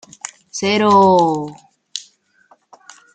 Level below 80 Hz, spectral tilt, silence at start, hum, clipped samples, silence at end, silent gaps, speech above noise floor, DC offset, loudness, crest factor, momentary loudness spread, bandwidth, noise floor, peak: -62 dBFS; -4.5 dB/octave; 0.55 s; none; under 0.1%; 1.15 s; none; 41 dB; under 0.1%; -14 LUFS; 16 dB; 21 LU; 9.4 kHz; -55 dBFS; -2 dBFS